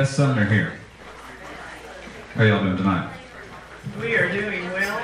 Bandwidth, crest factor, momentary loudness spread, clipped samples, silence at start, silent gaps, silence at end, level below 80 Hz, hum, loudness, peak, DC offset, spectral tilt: 14.5 kHz; 18 dB; 20 LU; under 0.1%; 0 s; none; 0 s; -52 dBFS; none; -22 LUFS; -4 dBFS; under 0.1%; -6.5 dB/octave